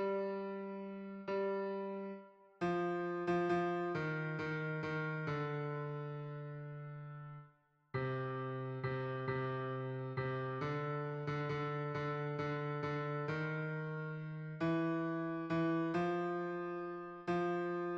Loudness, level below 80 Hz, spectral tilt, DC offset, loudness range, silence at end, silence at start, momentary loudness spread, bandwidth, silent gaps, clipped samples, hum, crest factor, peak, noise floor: -40 LUFS; -74 dBFS; -8.5 dB/octave; under 0.1%; 5 LU; 0 s; 0 s; 10 LU; 7.6 kHz; none; under 0.1%; none; 14 dB; -26 dBFS; -69 dBFS